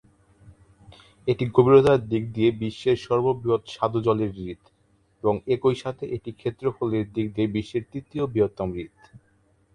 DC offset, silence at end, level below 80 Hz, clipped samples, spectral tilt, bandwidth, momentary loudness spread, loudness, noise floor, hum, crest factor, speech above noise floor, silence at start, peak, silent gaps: under 0.1%; 0.55 s; -52 dBFS; under 0.1%; -8 dB/octave; 9.6 kHz; 13 LU; -24 LUFS; -64 dBFS; none; 20 dB; 40 dB; 0.45 s; -4 dBFS; none